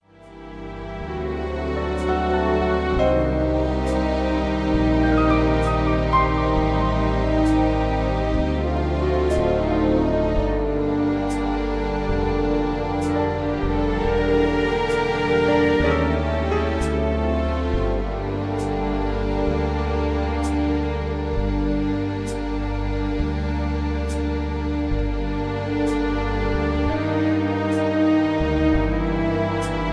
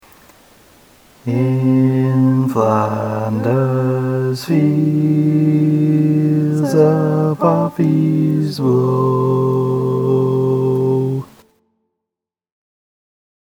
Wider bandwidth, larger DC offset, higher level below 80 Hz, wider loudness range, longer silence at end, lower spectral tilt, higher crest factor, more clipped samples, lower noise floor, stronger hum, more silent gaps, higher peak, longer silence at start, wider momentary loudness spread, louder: second, 11 kHz vs 16.5 kHz; neither; first, -28 dBFS vs -60 dBFS; about the same, 4 LU vs 4 LU; second, 0 s vs 2.15 s; second, -7.5 dB/octave vs -9 dB/octave; about the same, 14 dB vs 16 dB; neither; second, -42 dBFS vs -85 dBFS; neither; neither; second, -6 dBFS vs 0 dBFS; second, 0.2 s vs 1.25 s; about the same, 6 LU vs 5 LU; second, -22 LUFS vs -15 LUFS